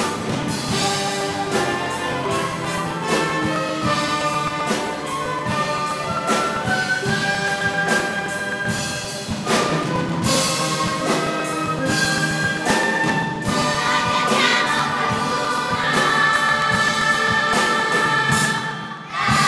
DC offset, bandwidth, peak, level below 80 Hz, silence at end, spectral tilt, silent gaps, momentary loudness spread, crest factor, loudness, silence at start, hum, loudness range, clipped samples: under 0.1%; 11 kHz; -4 dBFS; -48 dBFS; 0 s; -3.5 dB/octave; none; 7 LU; 16 dB; -20 LUFS; 0 s; none; 4 LU; under 0.1%